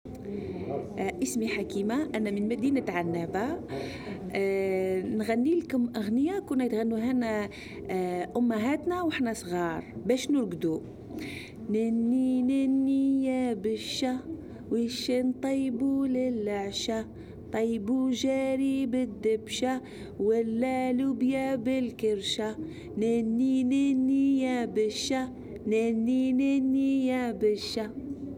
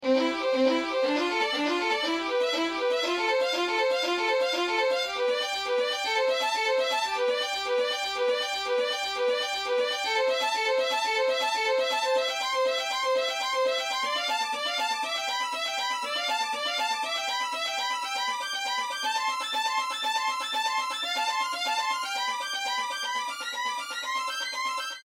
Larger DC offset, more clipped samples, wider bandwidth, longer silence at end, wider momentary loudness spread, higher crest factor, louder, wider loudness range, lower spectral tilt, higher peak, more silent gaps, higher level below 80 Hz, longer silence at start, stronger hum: neither; neither; about the same, 15 kHz vs 16.5 kHz; about the same, 0 s vs 0.05 s; first, 10 LU vs 4 LU; about the same, 16 dB vs 16 dB; about the same, -29 LUFS vs -27 LUFS; about the same, 3 LU vs 2 LU; first, -5.5 dB/octave vs 0 dB/octave; about the same, -12 dBFS vs -12 dBFS; neither; first, -58 dBFS vs -72 dBFS; about the same, 0.05 s vs 0 s; neither